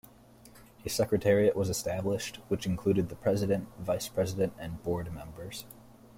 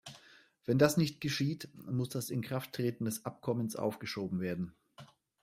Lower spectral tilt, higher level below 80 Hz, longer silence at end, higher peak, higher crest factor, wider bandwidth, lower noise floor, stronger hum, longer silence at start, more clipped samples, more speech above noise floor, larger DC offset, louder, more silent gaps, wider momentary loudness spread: about the same, -5.5 dB/octave vs -5.5 dB/octave; first, -56 dBFS vs -70 dBFS; about the same, 0.25 s vs 0.35 s; about the same, -14 dBFS vs -14 dBFS; about the same, 18 dB vs 22 dB; about the same, 16.5 kHz vs 16 kHz; second, -56 dBFS vs -62 dBFS; neither; first, 0.45 s vs 0.05 s; neither; about the same, 25 dB vs 28 dB; neither; first, -31 LUFS vs -35 LUFS; neither; about the same, 16 LU vs 14 LU